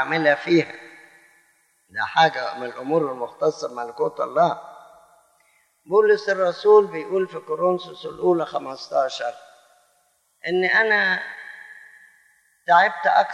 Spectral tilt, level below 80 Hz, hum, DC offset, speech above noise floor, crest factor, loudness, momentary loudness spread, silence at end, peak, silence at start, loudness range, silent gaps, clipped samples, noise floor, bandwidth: -5 dB/octave; -74 dBFS; none; under 0.1%; 44 dB; 20 dB; -21 LUFS; 17 LU; 0 s; -4 dBFS; 0 s; 5 LU; none; under 0.1%; -65 dBFS; 10.5 kHz